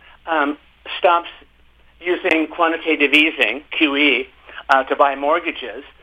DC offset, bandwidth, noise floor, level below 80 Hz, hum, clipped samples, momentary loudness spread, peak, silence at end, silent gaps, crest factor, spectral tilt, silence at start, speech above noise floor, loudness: under 0.1%; 13.5 kHz; -51 dBFS; -56 dBFS; none; under 0.1%; 16 LU; 0 dBFS; 0.15 s; none; 18 dB; -3.5 dB/octave; 0.25 s; 33 dB; -17 LUFS